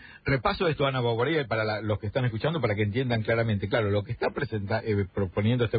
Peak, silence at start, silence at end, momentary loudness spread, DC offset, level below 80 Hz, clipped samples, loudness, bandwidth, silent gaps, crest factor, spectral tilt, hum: -10 dBFS; 0 s; 0 s; 4 LU; under 0.1%; -48 dBFS; under 0.1%; -27 LUFS; 5 kHz; none; 16 dB; -11 dB/octave; none